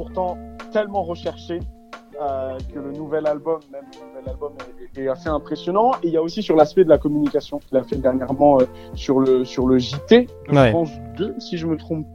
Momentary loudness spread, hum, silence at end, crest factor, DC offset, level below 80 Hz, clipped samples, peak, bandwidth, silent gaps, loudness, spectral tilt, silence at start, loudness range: 16 LU; none; 0 s; 20 dB; under 0.1%; -42 dBFS; under 0.1%; 0 dBFS; 10.5 kHz; none; -20 LUFS; -7 dB/octave; 0 s; 10 LU